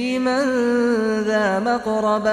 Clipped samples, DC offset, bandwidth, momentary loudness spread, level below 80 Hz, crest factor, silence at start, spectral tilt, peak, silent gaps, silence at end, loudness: under 0.1%; under 0.1%; 10.5 kHz; 2 LU; -56 dBFS; 10 dB; 0 s; -5 dB/octave; -8 dBFS; none; 0 s; -20 LUFS